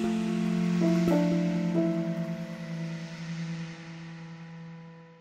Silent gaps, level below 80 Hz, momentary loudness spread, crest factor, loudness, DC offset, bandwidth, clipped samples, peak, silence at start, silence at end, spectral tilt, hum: none; -62 dBFS; 19 LU; 16 dB; -29 LUFS; under 0.1%; 9.2 kHz; under 0.1%; -14 dBFS; 0 s; 0.05 s; -7.5 dB/octave; none